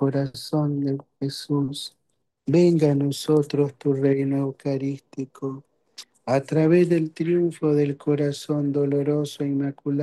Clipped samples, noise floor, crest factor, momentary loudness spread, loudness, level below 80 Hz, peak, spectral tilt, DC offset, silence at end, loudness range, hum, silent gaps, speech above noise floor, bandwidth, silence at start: under 0.1%; -47 dBFS; 16 dB; 14 LU; -23 LUFS; -68 dBFS; -8 dBFS; -7.5 dB/octave; under 0.1%; 0 s; 3 LU; none; none; 25 dB; 12.5 kHz; 0 s